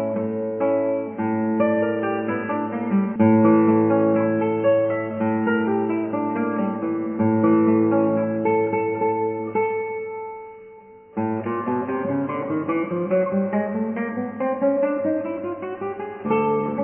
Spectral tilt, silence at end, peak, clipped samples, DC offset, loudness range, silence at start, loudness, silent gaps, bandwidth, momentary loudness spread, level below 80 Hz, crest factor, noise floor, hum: -12 dB/octave; 0 s; -6 dBFS; under 0.1%; under 0.1%; 7 LU; 0 s; -22 LUFS; none; 3.3 kHz; 10 LU; -62 dBFS; 16 dB; -45 dBFS; none